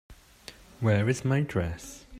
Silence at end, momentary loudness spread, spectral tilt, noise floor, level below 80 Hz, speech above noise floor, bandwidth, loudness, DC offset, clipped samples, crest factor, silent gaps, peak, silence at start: 0 s; 22 LU; -6.5 dB/octave; -51 dBFS; -52 dBFS; 24 dB; 15 kHz; -28 LUFS; under 0.1%; under 0.1%; 18 dB; none; -12 dBFS; 0.1 s